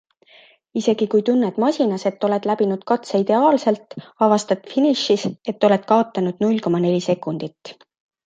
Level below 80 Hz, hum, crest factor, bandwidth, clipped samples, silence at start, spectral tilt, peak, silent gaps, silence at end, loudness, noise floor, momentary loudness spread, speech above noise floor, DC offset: -68 dBFS; none; 18 dB; 9.2 kHz; under 0.1%; 0.75 s; -6 dB/octave; -2 dBFS; none; 0.55 s; -19 LUFS; -51 dBFS; 7 LU; 32 dB; under 0.1%